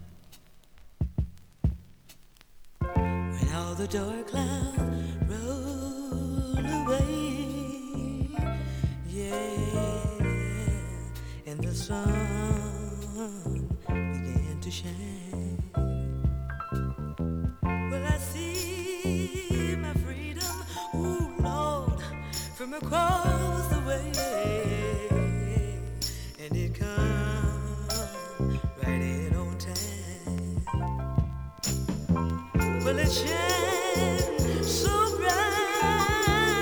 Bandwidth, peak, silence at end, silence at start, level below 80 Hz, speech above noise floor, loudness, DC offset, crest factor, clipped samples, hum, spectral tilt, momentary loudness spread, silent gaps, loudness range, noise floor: over 20 kHz; -10 dBFS; 0 s; 0 s; -36 dBFS; 24 dB; -30 LUFS; under 0.1%; 18 dB; under 0.1%; none; -5 dB/octave; 10 LU; none; 6 LU; -53 dBFS